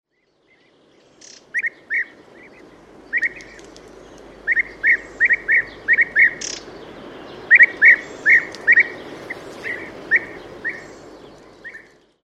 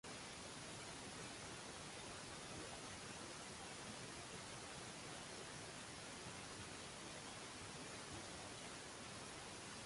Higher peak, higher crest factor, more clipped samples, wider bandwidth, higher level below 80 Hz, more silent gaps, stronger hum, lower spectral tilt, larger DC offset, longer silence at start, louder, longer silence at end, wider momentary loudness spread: first, -2 dBFS vs -38 dBFS; about the same, 20 dB vs 16 dB; neither; about the same, 11 kHz vs 11.5 kHz; first, -56 dBFS vs -70 dBFS; neither; neither; about the same, -2 dB/octave vs -2.5 dB/octave; neither; first, 1.55 s vs 0.05 s; first, -16 LUFS vs -52 LUFS; first, 0.45 s vs 0 s; first, 26 LU vs 1 LU